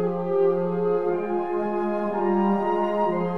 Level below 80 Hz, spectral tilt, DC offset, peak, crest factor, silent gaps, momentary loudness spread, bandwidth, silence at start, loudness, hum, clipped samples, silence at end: -60 dBFS; -9.5 dB/octave; 0.8%; -12 dBFS; 12 dB; none; 4 LU; 6 kHz; 0 s; -24 LUFS; none; under 0.1%; 0 s